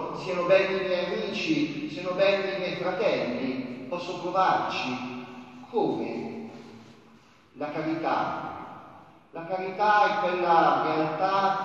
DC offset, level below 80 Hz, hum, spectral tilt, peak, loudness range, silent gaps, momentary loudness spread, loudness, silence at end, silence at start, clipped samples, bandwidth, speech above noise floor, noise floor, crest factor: under 0.1%; -70 dBFS; none; -5.5 dB/octave; -8 dBFS; 8 LU; none; 17 LU; -27 LUFS; 0 s; 0 s; under 0.1%; 8 kHz; 30 dB; -56 dBFS; 18 dB